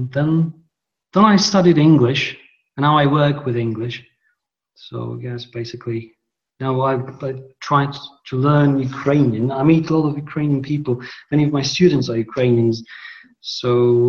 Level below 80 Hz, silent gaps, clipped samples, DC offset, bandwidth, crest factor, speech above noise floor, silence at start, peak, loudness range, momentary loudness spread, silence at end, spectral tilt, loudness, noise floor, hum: -54 dBFS; none; under 0.1%; under 0.1%; 7.2 kHz; 18 dB; 52 dB; 0 s; 0 dBFS; 10 LU; 16 LU; 0 s; -6.5 dB/octave; -18 LUFS; -69 dBFS; none